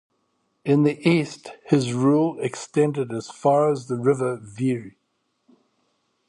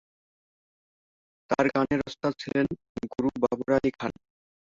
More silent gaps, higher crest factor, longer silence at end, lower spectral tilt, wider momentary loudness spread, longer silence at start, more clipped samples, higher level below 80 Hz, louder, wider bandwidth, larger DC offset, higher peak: second, none vs 2.89-2.95 s; about the same, 18 dB vs 22 dB; first, 1.4 s vs 0.65 s; about the same, -7 dB/octave vs -6.5 dB/octave; about the same, 11 LU vs 11 LU; second, 0.65 s vs 1.5 s; neither; second, -66 dBFS vs -58 dBFS; first, -22 LUFS vs -28 LUFS; first, 11.5 kHz vs 7.6 kHz; neither; first, -4 dBFS vs -8 dBFS